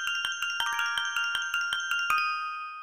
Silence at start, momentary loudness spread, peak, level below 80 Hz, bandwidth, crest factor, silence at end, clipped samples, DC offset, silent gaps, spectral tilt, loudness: 0 s; 3 LU; -12 dBFS; -70 dBFS; 16 kHz; 18 dB; 0 s; under 0.1%; 0.1%; none; 3 dB/octave; -28 LUFS